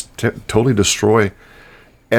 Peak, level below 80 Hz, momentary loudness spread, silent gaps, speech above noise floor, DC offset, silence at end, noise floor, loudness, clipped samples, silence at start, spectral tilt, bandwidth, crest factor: 0 dBFS; -42 dBFS; 8 LU; none; 30 dB; under 0.1%; 0 s; -46 dBFS; -16 LUFS; under 0.1%; 0 s; -4.5 dB/octave; 19 kHz; 16 dB